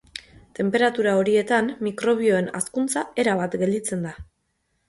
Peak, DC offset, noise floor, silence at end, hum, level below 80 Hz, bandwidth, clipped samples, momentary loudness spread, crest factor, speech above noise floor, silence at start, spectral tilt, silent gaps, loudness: -6 dBFS; under 0.1%; -72 dBFS; 0.65 s; none; -56 dBFS; 11.5 kHz; under 0.1%; 10 LU; 18 dB; 50 dB; 0.15 s; -4.5 dB/octave; none; -22 LUFS